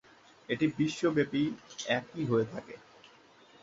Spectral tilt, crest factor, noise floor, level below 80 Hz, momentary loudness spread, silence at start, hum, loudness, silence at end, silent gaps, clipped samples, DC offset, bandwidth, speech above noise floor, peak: -5.5 dB/octave; 20 dB; -59 dBFS; -68 dBFS; 13 LU; 0.5 s; none; -32 LUFS; 0.85 s; none; under 0.1%; under 0.1%; 7.8 kHz; 28 dB; -12 dBFS